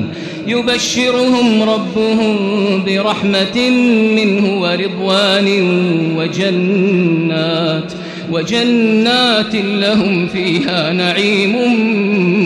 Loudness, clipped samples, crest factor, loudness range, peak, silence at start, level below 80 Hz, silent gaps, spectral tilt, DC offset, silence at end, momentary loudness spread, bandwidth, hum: -13 LUFS; under 0.1%; 10 dB; 1 LU; -2 dBFS; 0 s; -52 dBFS; none; -5 dB/octave; under 0.1%; 0 s; 5 LU; 12 kHz; none